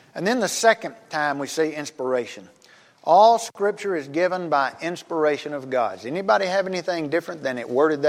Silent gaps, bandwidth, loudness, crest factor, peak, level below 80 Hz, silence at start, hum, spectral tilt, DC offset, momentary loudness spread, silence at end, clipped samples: none; 16 kHz; -22 LUFS; 18 dB; -4 dBFS; -80 dBFS; 0.15 s; none; -4 dB/octave; under 0.1%; 10 LU; 0 s; under 0.1%